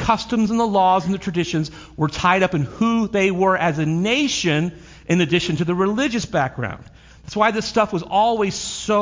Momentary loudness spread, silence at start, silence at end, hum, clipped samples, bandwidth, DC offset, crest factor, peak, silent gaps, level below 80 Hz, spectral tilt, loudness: 8 LU; 0 s; 0 s; none; under 0.1%; 7.6 kHz; under 0.1%; 18 dB; -2 dBFS; none; -46 dBFS; -5 dB/octave; -20 LUFS